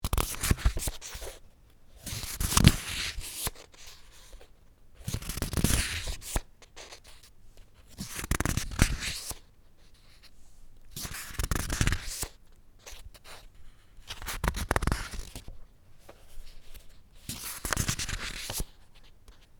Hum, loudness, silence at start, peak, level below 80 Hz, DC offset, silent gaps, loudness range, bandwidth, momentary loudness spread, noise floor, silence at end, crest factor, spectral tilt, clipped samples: none; -32 LUFS; 0 s; -2 dBFS; -38 dBFS; under 0.1%; none; 6 LU; over 20 kHz; 24 LU; -54 dBFS; 0.15 s; 32 dB; -3.5 dB/octave; under 0.1%